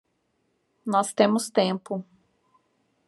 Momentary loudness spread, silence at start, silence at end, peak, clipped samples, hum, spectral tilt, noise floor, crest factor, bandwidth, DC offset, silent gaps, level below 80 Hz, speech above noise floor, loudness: 13 LU; 0.85 s; 1.05 s; -6 dBFS; under 0.1%; none; -4.5 dB/octave; -73 dBFS; 22 dB; 13 kHz; under 0.1%; none; -80 dBFS; 49 dB; -25 LUFS